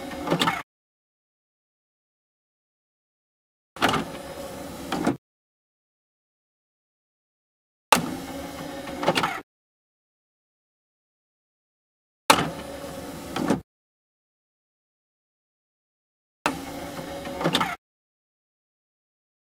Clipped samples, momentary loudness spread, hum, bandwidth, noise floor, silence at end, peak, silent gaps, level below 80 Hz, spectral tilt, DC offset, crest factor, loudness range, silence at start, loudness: under 0.1%; 15 LU; none; 16 kHz; under -90 dBFS; 1.7 s; 0 dBFS; 0.63-3.76 s, 5.18-7.92 s, 9.43-12.29 s, 13.64-16.45 s; -58 dBFS; -3.5 dB/octave; under 0.1%; 32 dB; 8 LU; 0 s; -27 LUFS